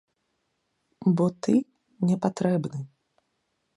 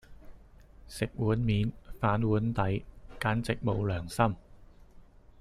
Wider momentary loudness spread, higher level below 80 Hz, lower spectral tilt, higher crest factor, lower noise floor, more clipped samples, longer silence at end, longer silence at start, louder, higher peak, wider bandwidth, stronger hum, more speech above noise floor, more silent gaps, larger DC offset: first, 15 LU vs 8 LU; second, -68 dBFS vs -48 dBFS; about the same, -8 dB/octave vs -7 dB/octave; about the same, 20 dB vs 20 dB; first, -76 dBFS vs -54 dBFS; neither; first, 0.9 s vs 0.4 s; first, 1 s vs 0.1 s; first, -26 LUFS vs -31 LUFS; first, -8 dBFS vs -12 dBFS; second, 11 kHz vs 13.5 kHz; neither; first, 52 dB vs 25 dB; neither; neither